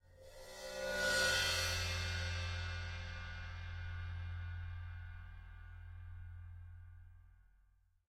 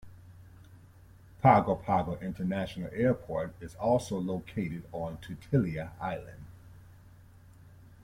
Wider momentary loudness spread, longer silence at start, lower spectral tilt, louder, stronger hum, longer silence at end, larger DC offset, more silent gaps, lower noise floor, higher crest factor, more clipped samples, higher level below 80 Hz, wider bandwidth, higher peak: first, 22 LU vs 15 LU; about the same, 0.05 s vs 0.05 s; second, -2.5 dB/octave vs -7.5 dB/octave; second, -39 LUFS vs -31 LUFS; neither; first, 0.6 s vs 0 s; neither; neither; first, -72 dBFS vs -55 dBFS; about the same, 20 dB vs 24 dB; neither; about the same, -52 dBFS vs -56 dBFS; about the same, 16 kHz vs 16 kHz; second, -24 dBFS vs -10 dBFS